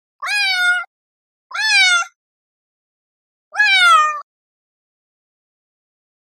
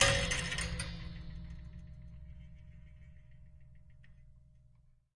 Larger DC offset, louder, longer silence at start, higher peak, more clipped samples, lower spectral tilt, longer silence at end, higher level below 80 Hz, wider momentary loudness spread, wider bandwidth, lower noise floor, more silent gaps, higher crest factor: neither; first, -13 LUFS vs -37 LUFS; first, 0.2 s vs 0 s; first, -2 dBFS vs -8 dBFS; neither; second, 7.5 dB/octave vs -2.5 dB/octave; first, 2 s vs 0.75 s; second, under -90 dBFS vs -48 dBFS; second, 18 LU vs 26 LU; first, 13 kHz vs 11.5 kHz; first, under -90 dBFS vs -65 dBFS; first, 0.87-1.50 s, 2.16-3.51 s vs none; second, 18 dB vs 30 dB